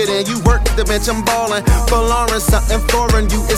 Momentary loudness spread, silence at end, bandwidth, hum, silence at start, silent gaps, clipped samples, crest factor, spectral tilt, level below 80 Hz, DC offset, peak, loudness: 2 LU; 0 s; 16 kHz; none; 0 s; none; under 0.1%; 14 dB; -4.5 dB/octave; -18 dBFS; under 0.1%; 0 dBFS; -15 LUFS